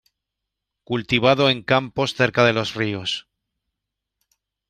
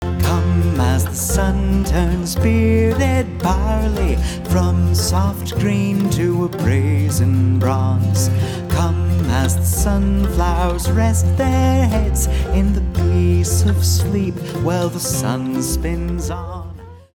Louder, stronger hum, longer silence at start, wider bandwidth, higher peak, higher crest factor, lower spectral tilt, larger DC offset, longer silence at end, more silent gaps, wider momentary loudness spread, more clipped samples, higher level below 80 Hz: second, -20 LUFS vs -17 LUFS; neither; first, 0.9 s vs 0 s; second, 13.5 kHz vs 18.5 kHz; about the same, -2 dBFS vs -2 dBFS; first, 20 dB vs 14 dB; about the same, -5 dB/octave vs -6 dB/octave; neither; first, 1.5 s vs 0.15 s; neither; first, 11 LU vs 5 LU; neither; second, -56 dBFS vs -24 dBFS